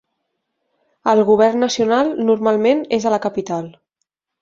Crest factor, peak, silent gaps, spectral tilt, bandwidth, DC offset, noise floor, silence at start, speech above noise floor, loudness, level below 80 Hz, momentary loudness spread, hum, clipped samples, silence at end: 16 dB; -2 dBFS; none; -5 dB/octave; 7.6 kHz; under 0.1%; -76 dBFS; 1.05 s; 60 dB; -17 LUFS; -60 dBFS; 10 LU; none; under 0.1%; 0.7 s